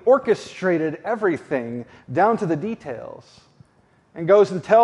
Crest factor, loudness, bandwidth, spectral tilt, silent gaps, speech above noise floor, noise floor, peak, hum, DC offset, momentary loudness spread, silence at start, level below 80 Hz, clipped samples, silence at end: 18 dB; -21 LUFS; 11 kHz; -7 dB/octave; none; 39 dB; -59 dBFS; -2 dBFS; none; under 0.1%; 16 LU; 0.05 s; -66 dBFS; under 0.1%; 0 s